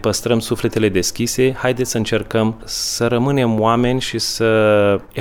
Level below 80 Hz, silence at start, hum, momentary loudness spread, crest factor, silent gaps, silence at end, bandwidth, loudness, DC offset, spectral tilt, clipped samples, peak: -42 dBFS; 0 s; none; 5 LU; 14 dB; none; 0 s; 18 kHz; -17 LUFS; under 0.1%; -4.5 dB/octave; under 0.1%; -2 dBFS